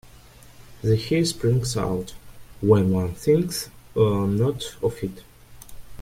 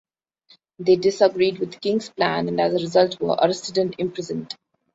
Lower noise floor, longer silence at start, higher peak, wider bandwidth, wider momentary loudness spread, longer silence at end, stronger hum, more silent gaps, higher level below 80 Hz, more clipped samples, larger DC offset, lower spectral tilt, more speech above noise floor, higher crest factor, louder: second, -47 dBFS vs -58 dBFS; second, 0.5 s vs 0.8 s; about the same, -4 dBFS vs -2 dBFS; first, 16.5 kHz vs 8 kHz; about the same, 11 LU vs 11 LU; second, 0 s vs 0.4 s; neither; neither; first, -48 dBFS vs -64 dBFS; neither; neither; about the same, -6.5 dB/octave vs -5.5 dB/octave; second, 26 dB vs 37 dB; about the same, 20 dB vs 20 dB; about the same, -23 LUFS vs -21 LUFS